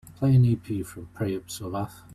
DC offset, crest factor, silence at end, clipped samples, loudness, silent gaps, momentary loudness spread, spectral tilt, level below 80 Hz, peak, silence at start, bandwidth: under 0.1%; 14 dB; 0 s; under 0.1%; -26 LUFS; none; 13 LU; -7.5 dB/octave; -52 dBFS; -10 dBFS; 0.05 s; 14 kHz